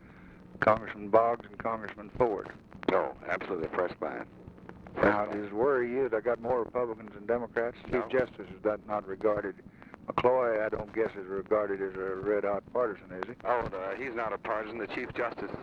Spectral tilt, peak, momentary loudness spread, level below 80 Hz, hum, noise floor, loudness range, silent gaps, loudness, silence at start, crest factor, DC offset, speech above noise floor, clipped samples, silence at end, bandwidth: -8 dB/octave; -10 dBFS; 13 LU; -58 dBFS; none; -52 dBFS; 3 LU; none; -31 LUFS; 0 s; 22 dB; under 0.1%; 21 dB; under 0.1%; 0 s; 6.8 kHz